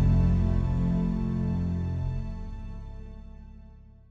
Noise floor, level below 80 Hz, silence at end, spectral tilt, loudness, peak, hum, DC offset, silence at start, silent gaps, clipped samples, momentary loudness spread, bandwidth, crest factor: -49 dBFS; -32 dBFS; 0.2 s; -10 dB/octave; -28 LUFS; -12 dBFS; none; under 0.1%; 0 s; none; under 0.1%; 22 LU; 6.2 kHz; 14 dB